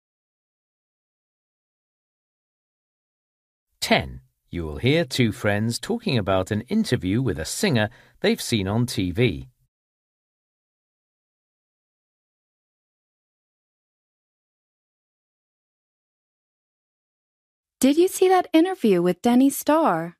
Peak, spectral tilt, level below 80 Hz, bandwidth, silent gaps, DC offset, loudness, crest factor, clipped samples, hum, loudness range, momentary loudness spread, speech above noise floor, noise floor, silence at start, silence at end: -4 dBFS; -5.5 dB/octave; -52 dBFS; 15.5 kHz; 9.68-17.63 s; under 0.1%; -22 LUFS; 20 dB; under 0.1%; none; 9 LU; 7 LU; over 69 dB; under -90 dBFS; 3.8 s; 0.1 s